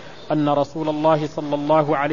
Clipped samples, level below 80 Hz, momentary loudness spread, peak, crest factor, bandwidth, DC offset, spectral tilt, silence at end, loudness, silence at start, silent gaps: under 0.1%; -56 dBFS; 7 LU; -4 dBFS; 16 dB; 7.4 kHz; 0.8%; -7.5 dB/octave; 0 s; -20 LUFS; 0 s; none